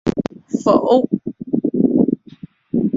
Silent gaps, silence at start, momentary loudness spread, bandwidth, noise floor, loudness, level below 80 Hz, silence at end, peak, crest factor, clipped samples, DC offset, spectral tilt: none; 0.05 s; 10 LU; 7.8 kHz; -39 dBFS; -18 LUFS; -48 dBFS; 0 s; -2 dBFS; 16 dB; under 0.1%; under 0.1%; -8 dB/octave